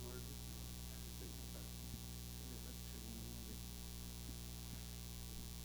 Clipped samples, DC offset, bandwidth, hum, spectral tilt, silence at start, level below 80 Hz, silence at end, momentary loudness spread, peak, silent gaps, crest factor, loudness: under 0.1%; under 0.1%; over 20 kHz; 60 Hz at -50 dBFS; -4 dB/octave; 0 s; -54 dBFS; 0 s; 1 LU; -34 dBFS; none; 16 dB; -50 LUFS